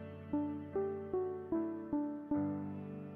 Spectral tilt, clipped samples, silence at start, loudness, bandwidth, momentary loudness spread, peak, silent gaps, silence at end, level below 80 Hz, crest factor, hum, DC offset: -11 dB/octave; under 0.1%; 0 s; -39 LUFS; 3.5 kHz; 4 LU; -26 dBFS; none; 0 s; -68 dBFS; 12 dB; none; under 0.1%